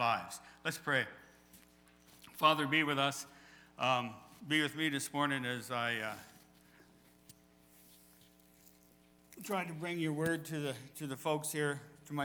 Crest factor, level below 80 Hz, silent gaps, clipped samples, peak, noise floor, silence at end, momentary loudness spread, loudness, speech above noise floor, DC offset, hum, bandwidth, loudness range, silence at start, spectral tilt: 24 dB; -76 dBFS; none; under 0.1%; -14 dBFS; -65 dBFS; 0 s; 15 LU; -35 LUFS; 30 dB; under 0.1%; none; over 20 kHz; 11 LU; 0 s; -4 dB/octave